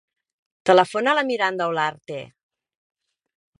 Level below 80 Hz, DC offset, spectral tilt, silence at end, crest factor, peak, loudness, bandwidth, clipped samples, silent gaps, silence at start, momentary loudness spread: -70 dBFS; under 0.1%; -4.5 dB/octave; 1.35 s; 22 dB; -2 dBFS; -20 LUFS; 11.5 kHz; under 0.1%; none; 0.65 s; 18 LU